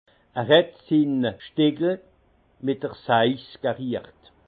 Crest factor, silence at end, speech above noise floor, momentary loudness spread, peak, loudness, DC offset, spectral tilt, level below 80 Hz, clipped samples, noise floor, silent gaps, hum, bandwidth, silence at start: 20 dB; 0.45 s; 38 dB; 12 LU; -4 dBFS; -24 LUFS; under 0.1%; -9 dB/octave; -66 dBFS; under 0.1%; -61 dBFS; none; none; 4.8 kHz; 0.35 s